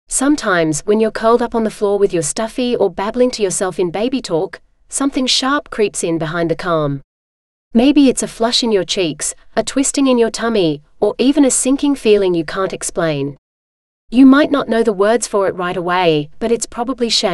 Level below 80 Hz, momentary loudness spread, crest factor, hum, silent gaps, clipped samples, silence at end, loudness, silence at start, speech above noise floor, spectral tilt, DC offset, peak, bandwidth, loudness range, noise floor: -42 dBFS; 7 LU; 16 dB; none; 7.04-7.71 s, 13.38-14.08 s; under 0.1%; 0 s; -15 LUFS; 0.1 s; over 75 dB; -4 dB/octave; under 0.1%; 0 dBFS; 13 kHz; 3 LU; under -90 dBFS